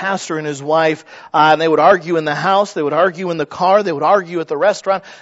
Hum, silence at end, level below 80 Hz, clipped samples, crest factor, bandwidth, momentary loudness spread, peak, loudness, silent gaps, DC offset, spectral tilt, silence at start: none; 0.05 s; -66 dBFS; under 0.1%; 16 dB; 8 kHz; 10 LU; 0 dBFS; -15 LUFS; none; under 0.1%; -5 dB/octave; 0 s